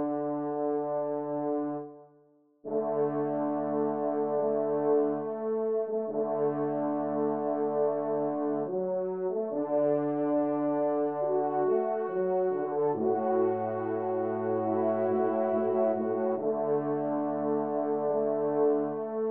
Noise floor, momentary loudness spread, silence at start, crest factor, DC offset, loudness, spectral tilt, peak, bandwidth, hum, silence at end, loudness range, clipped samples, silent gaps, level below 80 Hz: -63 dBFS; 4 LU; 0 s; 14 dB; under 0.1%; -30 LUFS; -9 dB/octave; -16 dBFS; 3.1 kHz; none; 0 s; 3 LU; under 0.1%; none; -82 dBFS